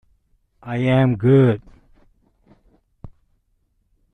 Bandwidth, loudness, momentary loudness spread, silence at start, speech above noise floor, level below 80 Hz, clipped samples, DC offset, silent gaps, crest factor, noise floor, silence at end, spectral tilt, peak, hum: 3.9 kHz; -18 LUFS; 14 LU; 0.65 s; 50 dB; -50 dBFS; under 0.1%; under 0.1%; none; 18 dB; -66 dBFS; 1.05 s; -9.5 dB/octave; -4 dBFS; none